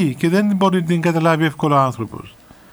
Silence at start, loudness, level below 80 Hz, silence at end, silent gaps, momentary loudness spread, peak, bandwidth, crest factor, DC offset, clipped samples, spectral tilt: 0 s; -17 LUFS; -56 dBFS; 0.45 s; none; 12 LU; -2 dBFS; over 20 kHz; 16 dB; under 0.1%; under 0.1%; -7 dB/octave